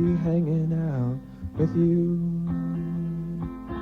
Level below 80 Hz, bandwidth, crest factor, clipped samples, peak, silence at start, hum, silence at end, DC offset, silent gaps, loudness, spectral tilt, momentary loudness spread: -44 dBFS; 3.9 kHz; 14 dB; under 0.1%; -12 dBFS; 0 s; none; 0 s; under 0.1%; none; -26 LUFS; -11 dB/octave; 11 LU